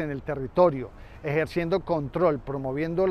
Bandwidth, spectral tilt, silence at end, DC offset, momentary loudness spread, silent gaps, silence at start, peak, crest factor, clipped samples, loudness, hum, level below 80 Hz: 12.5 kHz; -8.5 dB/octave; 0 s; under 0.1%; 11 LU; none; 0 s; -8 dBFS; 18 dB; under 0.1%; -26 LUFS; none; -48 dBFS